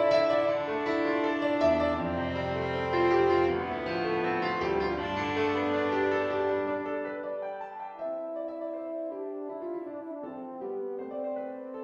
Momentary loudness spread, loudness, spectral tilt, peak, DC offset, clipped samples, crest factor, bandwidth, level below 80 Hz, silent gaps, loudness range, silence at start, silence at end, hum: 12 LU; -30 LUFS; -6.5 dB/octave; -14 dBFS; under 0.1%; under 0.1%; 16 dB; 7.6 kHz; -56 dBFS; none; 9 LU; 0 s; 0 s; none